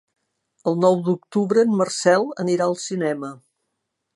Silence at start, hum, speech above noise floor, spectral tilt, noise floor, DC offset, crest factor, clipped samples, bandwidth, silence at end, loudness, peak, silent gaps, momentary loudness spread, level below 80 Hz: 0.65 s; none; 58 dB; -5.5 dB/octave; -78 dBFS; under 0.1%; 20 dB; under 0.1%; 11.5 kHz; 0.8 s; -21 LUFS; -2 dBFS; none; 8 LU; -72 dBFS